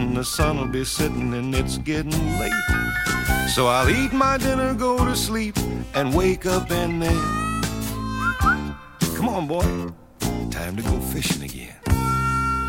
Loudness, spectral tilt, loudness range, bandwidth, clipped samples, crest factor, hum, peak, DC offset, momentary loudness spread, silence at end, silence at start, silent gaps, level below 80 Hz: -22 LUFS; -5 dB/octave; 4 LU; 16.5 kHz; under 0.1%; 18 dB; none; -4 dBFS; under 0.1%; 8 LU; 0 s; 0 s; none; -32 dBFS